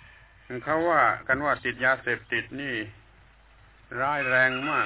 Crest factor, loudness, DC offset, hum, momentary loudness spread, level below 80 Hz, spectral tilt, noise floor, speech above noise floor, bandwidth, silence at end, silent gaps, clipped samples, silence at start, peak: 18 dB; -25 LUFS; under 0.1%; none; 13 LU; -56 dBFS; -8 dB/octave; -55 dBFS; 30 dB; 4 kHz; 0 s; none; under 0.1%; 0.5 s; -8 dBFS